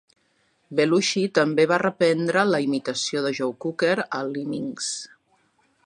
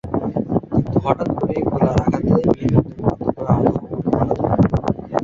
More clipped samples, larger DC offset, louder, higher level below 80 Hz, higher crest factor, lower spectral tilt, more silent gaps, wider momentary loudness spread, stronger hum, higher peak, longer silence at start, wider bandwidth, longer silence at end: neither; neither; second, -23 LUFS vs -19 LUFS; second, -72 dBFS vs -36 dBFS; about the same, 20 dB vs 16 dB; second, -4 dB/octave vs -9.5 dB/octave; neither; first, 9 LU vs 5 LU; neither; about the same, -4 dBFS vs -2 dBFS; first, 0.7 s vs 0.05 s; first, 11 kHz vs 7.6 kHz; first, 0.8 s vs 0 s